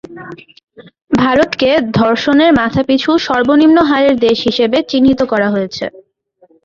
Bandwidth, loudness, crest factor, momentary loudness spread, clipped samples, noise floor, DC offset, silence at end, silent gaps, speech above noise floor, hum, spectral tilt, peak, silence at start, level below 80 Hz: 7.4 kHz; -12 LUFS; 12 dB; 11 LU; under 0.1%; -52 dBFS; under 0.1%; 0.65 s; none; 40 dB; none; -6 dB/octave; 0 dBFS; 0.1 s; -44 dBFS